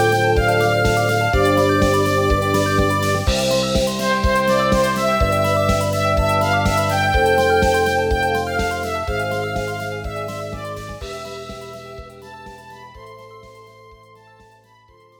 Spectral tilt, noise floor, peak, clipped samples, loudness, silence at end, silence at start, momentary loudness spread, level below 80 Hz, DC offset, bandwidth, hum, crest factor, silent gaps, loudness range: -5 dB/octave; -51 dBFS; -4 dBFS; under 0.1%; -18 LUFS; 1.55 s; 0 s; 19 LU; -30 dBFS; under 0.1%; over 20 kHz; none; 16 dB; none; 16 LU